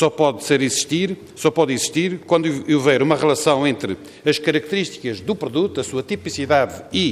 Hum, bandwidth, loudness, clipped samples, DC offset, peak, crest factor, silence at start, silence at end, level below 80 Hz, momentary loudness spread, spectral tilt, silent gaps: none; 15.5 kHz; -19 LUFS; under 0.1%; under 0.1%; -2 dBFS; 16 dB; 0 s; 0 s; -60 dBFS; 8 LU; -4.5 dB/octave; none